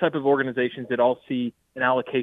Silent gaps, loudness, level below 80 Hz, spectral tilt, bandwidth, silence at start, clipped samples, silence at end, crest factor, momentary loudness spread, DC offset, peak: none; -24 LUFS; -68 dBFS; -8.5 dB/octave; 4.1 kHz; 0 s; under 0.1%; 0 s; 16 dB; 7 LU; under 0.1%; -8 dBFS